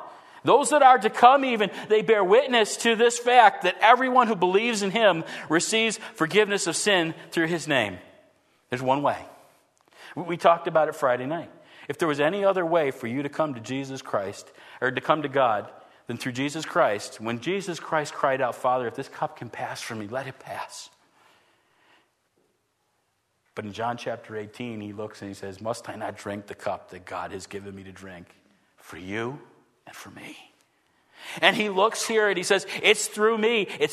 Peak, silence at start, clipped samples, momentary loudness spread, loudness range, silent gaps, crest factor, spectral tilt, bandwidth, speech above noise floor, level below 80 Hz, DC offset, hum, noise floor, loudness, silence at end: -2 dBFS; 0 s; under 0.1%; 20 LU; 18 LU; none; 24 dB; -3.5 dB/octave; 13.5 kHz; 48 dB; -72 dBFS; under 0.1%; none; -72 dBFS; -23 LUFS; 0 s